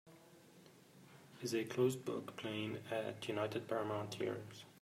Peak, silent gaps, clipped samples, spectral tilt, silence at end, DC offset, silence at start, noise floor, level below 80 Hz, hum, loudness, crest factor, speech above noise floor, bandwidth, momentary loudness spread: -22 dBFS; none; under 0.1%; -5.5 dB/octave; 0.05 s; under 0.1%; 0.05 s; -63 dBFS; -84 dBFS; none; -41 LUFS; 20 dB; 22 dB; 16 kHz; 24 LU